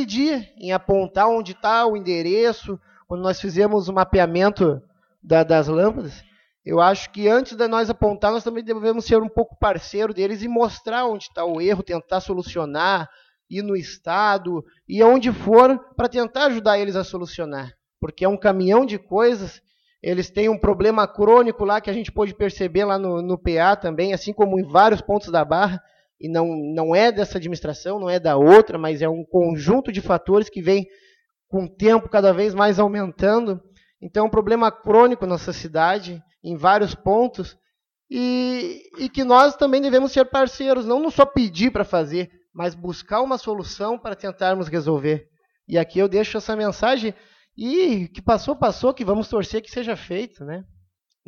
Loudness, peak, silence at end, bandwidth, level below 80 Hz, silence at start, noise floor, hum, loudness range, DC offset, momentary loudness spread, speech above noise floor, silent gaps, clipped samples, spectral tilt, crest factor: -20 LUFS; 0 dBFS; 0.65 s; 7.2 kHz; -44 dBFS; 0 s; -75 dBFS; none; 5 LU; under 0.1%; 13 LU; 56 dB; none; under 0.1%; -6.5 dB/octave; 20 dB